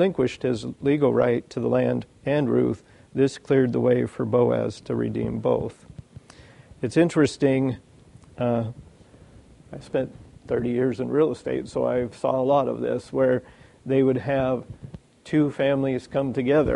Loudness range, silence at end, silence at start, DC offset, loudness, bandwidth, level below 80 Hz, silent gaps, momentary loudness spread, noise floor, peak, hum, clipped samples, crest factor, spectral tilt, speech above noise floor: 4 LU; 0 s; 0 s; under 0.1%; -24 LUFS; 11 kHz; -52 dBFS; none; 9 LU; -50 dBFS; -6 dBFS; none; under 0.1%; 18 dB; -7.5 dB/octave; 27 dB